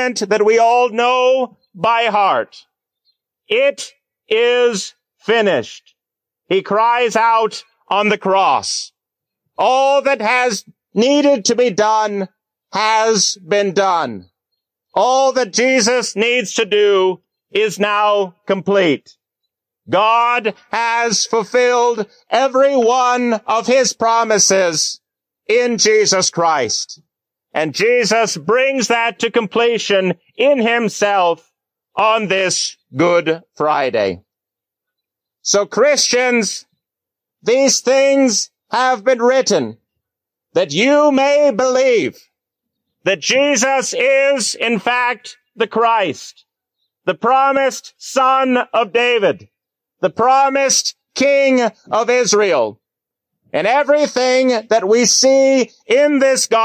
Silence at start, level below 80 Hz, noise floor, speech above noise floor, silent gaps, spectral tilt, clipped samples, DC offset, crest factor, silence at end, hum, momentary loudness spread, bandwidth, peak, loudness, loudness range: 0 s; -66 dBFS; -84 dBFS; 70 dB; none; -2.5 dB/octave; under 0.1%; under 0.1%; 14 dB; 0 s; none; 9 LU; 15.5 kHz; -2 dBFS; -15 LUFS; 3 LU